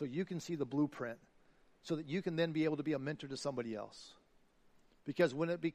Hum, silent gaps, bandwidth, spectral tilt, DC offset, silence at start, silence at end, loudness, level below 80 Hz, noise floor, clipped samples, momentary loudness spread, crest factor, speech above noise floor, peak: none; none; 14 kHz; -6.5 dB/octave; under 0.1%; 0 s; 0.05 s; -39 LUFS; -76 dBFS; -69 dBFS; under 0.1%; 16 LU; 20 dB; 31 dB; -18 dBFS